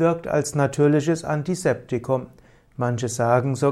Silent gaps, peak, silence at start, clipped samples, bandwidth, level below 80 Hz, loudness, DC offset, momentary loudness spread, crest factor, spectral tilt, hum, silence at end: none; -4 dBFS; 0 s; under 0.1%; 14 kHz; -54 dBFS; -22 LUFS; under 0.1%; 8 LU; 16 dB; -6.5 dB/octave; none; 0 s